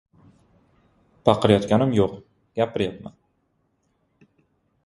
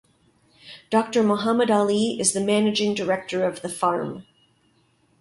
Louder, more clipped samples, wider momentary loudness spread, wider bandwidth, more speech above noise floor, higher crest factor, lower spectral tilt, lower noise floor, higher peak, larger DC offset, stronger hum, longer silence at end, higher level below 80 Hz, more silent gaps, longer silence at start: about the same, -22 LUFS vs -22 LUFS; neither; first, 23 LU vs 10 LU; about the same, 11.5 kHz vs 11.5 kHz; first, 49 dB vs 41 dB; first, 24 dB vs 18 dB; first, -7 dB/octave vs -4 dB/octave; first, -70 dBFS vs -63 dBFS; first, 0 dBFS vs -6 dBFS; neither; neither; first, 1.75 s vs 1 s; first, -52 dBFS vs -66 dBFS; neither; first, 1.25 s vs 0.65 s